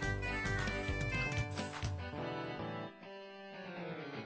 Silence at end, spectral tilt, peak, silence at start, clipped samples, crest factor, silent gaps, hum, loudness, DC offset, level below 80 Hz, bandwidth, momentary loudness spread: 0 s; -5.5 dB/octave; -24 dBFS; 0 s; under 0.1%; 16 dB; none; none; -40 LUFS; under 0.1%; -50 dBFS; 8 kHz; 13 LU